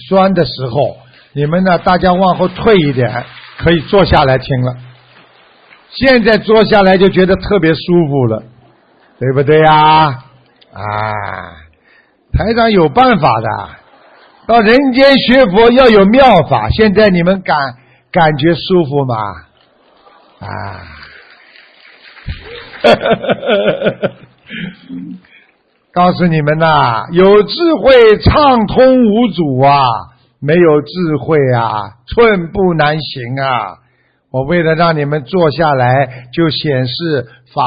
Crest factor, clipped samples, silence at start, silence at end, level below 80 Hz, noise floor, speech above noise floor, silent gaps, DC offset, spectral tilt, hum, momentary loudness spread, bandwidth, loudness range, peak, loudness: 12 dB; under 0.1%; 0 s; 0 s; -32 dBFS; -55 dBFS; 45 dB; none; under 0.1%; -8.5 dB/octave; none; 17 LU; 6.6 kHz; 7 LU; 0 dBFS; -10 LUFS